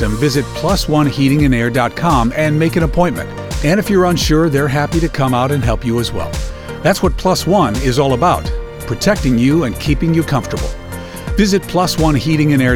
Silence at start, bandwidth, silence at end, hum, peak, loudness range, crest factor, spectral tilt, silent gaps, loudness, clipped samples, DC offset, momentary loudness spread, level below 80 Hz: 0 s; 18 kHz; 0 s; none; 0 dBFS; 2 LU; 14 dB; -6 dB/octave; none; -15 LUFS; under 0.1%; under 0.1%; 10 LU; -26 dBFS